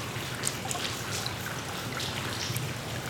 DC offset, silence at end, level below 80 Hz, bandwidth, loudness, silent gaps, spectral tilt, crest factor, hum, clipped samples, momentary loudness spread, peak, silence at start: under 0.1%; 0 s; -56 dBFS; over 20 kHz; -32 LUFS; none; -3 dB/octave; 26 dB; none; under 0.1%; 3 LU; -8 dBFS; 0 s